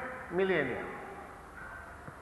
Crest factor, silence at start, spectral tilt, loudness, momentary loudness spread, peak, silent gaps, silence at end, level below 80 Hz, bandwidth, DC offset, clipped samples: 20 dB; 0 s; -6.5 dB/octave; -34 LUFS; 17 LU; -18 dBFS; none; 0 s; -58 dBFS; 12 kHz; under 0.1%; under 0.1%